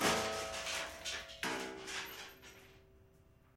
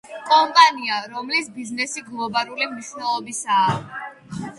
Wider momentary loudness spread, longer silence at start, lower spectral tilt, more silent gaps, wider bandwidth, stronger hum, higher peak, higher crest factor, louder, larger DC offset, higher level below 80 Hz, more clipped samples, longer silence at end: first, 19 LU vs 16 LU; about the same, 0 s vs 0.05 s; about the same, -2 dB/octave vs -2.5 dB/octave; neither; first, 16 kHz vs 11.5 kHz; neither; second, -20 dBFS vs 0 dBFS; about the same, 22 dB vs 22 dB; second, -40 LUFS vs -20 LUFS; neither; about the same, -64 dBFS vs -64 dBFS; neither; first, 0.5 s vs 0 s